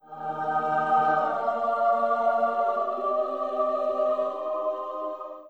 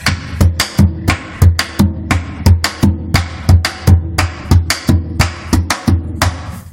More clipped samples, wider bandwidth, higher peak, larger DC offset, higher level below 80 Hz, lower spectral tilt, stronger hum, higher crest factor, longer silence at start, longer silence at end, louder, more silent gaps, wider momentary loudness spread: second, under 0.1% vs 0.4%; second, 8 kHz vs 17 kHz; second, -12 dBFS vs 0 dBFS; first, 0.1% vs under 0.1%; second, -74 dBFS vs -22 dBFS; first, -6.5 dB/octave vs -5 dB/octave; neither; about the same, 14 dB vs 12 dB; about the same, 0.05 s vs 0 s; about the same, 0 s vs 0 s; second, -26 LUFS vs -14 LUFS; neither; first, 8 LU vs 5 LU